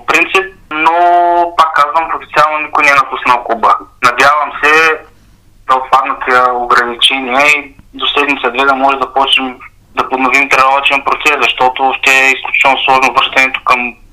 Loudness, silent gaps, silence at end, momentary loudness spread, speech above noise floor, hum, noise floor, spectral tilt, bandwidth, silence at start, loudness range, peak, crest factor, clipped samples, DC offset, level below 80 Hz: -9 LUFS; none; 0.2 s; 6 LU; 33 dB; none; -44 dBFS; -2 dB/octave; 16.5 kHz; 0 s; 2 LU; 0 dBFS; 10 dB; 0.3%; 0.3%; -44 dBFS